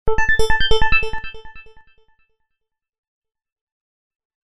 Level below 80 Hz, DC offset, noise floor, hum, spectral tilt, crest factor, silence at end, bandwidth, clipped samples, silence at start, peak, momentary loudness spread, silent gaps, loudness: -28 dBFS; under 0.1%; -78 dBFS; none; -3.5 dB/octave; 18 dB; 0.2 s; 10.5 kHz; under 0.1%; 0.05 s; 0 dBFS; 26 LU; 2.98-3.22 s, 3.52-4.30 s; -18 LUFS